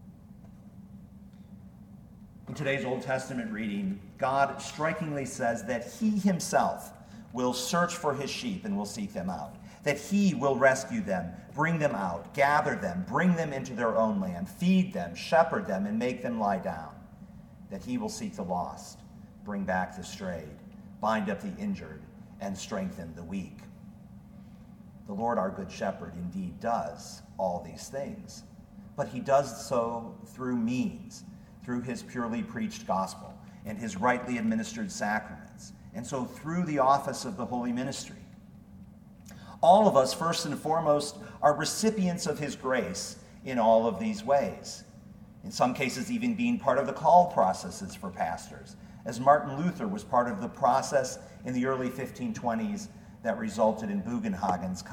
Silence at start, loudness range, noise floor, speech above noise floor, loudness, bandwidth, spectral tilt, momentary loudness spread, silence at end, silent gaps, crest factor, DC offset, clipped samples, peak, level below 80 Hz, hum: 0 s; 8 LU; -51 dBFS; 21 dB; -30 LUFS; 17.5 kHz; -5.5 dB/octave; 21 LU; 0 s; none; 22 dB; under 0.1%; under 0.1%; -8 dBFS; -60 dBFS; none